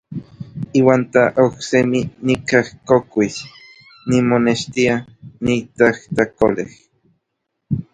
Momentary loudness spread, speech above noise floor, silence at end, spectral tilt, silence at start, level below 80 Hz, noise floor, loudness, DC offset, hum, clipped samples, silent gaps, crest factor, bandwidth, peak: 16 LU; 59 dB; 0.1 s; -6 dB/octave; 0.1 s; -50 dBFS; -75 dBFS; -17 LUFS; under 0.1%; none; under 0.1%; none; 18 dB; 9.4 kHz; 0 dBFS